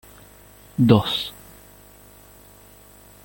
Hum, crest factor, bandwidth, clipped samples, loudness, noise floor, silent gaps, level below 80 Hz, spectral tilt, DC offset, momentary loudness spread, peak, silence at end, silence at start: 50 Hz at -50 dBFS; 22 dB; 17 kHz; under 0.1%; -20 LUFS; -48 dBFS; none; -52 dBFS; -7 dB/octave; under 0.1%; 18 LU; -2 dBFS; 1.95 s; 0.8 s